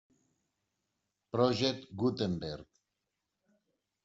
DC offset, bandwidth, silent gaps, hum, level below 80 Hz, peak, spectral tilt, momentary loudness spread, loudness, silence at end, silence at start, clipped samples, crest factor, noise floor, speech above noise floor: under 0.1%; 8 kHz; none; none; -68 dBFS; -14 dBFS; -5 dB/octave; 12 LU; -33 LUFS; 1.4 s; 1.35 s; under 0.1%; 24 dB; -86 dBFS; 54 dB